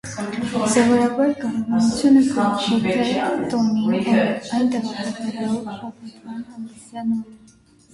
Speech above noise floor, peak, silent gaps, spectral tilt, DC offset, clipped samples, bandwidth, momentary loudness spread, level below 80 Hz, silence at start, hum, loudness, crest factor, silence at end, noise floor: 32 dB; -4 dBFS; none; -5 dB/octave; under 0.1%; under 0.1%; 11.5 kHz; 18 LU; -56 dBFS; 0.05 s; none; -20 LUFS; 16 dB; 0.55 s; -51 dBFS